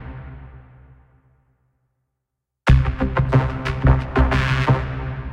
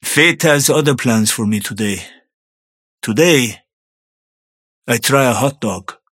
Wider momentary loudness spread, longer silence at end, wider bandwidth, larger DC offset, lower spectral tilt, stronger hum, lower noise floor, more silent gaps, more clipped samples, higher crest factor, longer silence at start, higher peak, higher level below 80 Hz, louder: first, 19 LU vs 11 LU; second, 0 s vs 0.25 s; second, 7.8 kHz vs 17.5 kHz; neither; first, -7.5 dB/octave vs -4 dB/octave; neither; second, -80 dBFS vs under -90 dBFS; second, none vs 2.34-2.98 s, 3.73-4.82 s; neither; about the same, 20 dB vs 16 dB; about the same, 0 s vs 0.05 s; about the same, 0 dBFS vs 0 dBFS; first, -26 dBFS vs -58 dBFS; second, -19 LUFS vs -14 LUFS